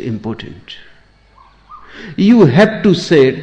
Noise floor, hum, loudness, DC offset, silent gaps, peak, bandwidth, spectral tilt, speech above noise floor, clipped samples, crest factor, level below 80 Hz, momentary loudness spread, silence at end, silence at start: -46 dBFS; none; -11 LUFS; under 0.1%; none; 0 dBFS; 9.2 kHz; -7 dB/octave; 35 dB; under 0.1%; 12 dB; -46 dBFS; 24 LU; 0 s; 0 s